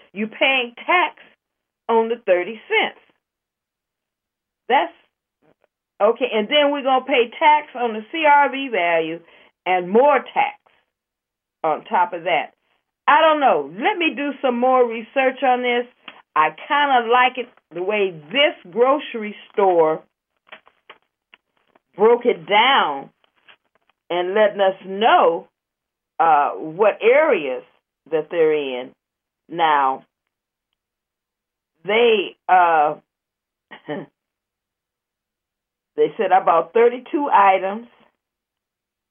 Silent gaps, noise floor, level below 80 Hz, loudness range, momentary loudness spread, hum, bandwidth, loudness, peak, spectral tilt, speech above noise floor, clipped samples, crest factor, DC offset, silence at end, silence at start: none; -84 dBFS; -86 dBFS; 6 LU; 14 LU; none; 3.7 kHz; -18 LUFS; -2 dBFS; -8 dB/octave; 66 dB; under 0.1%; 18 dB; under 0.1%; 1.25 s; 0.15 s